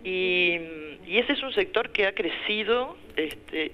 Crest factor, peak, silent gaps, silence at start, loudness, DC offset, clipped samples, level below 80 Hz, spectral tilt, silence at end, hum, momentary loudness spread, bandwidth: 20 dB; -6 dBFS; none; 0 s; -26 LUFS; under 0.1%; under 0.1%; -56 dBFS; -5 dB/octave; 0 s; none; 9 LU; 14 kHz